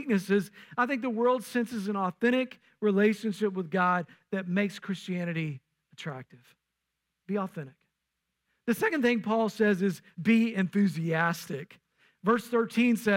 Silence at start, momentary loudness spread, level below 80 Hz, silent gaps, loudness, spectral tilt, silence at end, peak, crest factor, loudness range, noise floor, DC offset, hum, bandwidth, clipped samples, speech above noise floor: 0 s; 13 LU; -76 dBFS; none; -29 LUFS; -6.5 dB/octave; 0 s; -14 dBFS; 16 dB; 10 LU; -84 dBFS; under 0.1%; none; 16.5 kHz; under 0.1%; 56 dB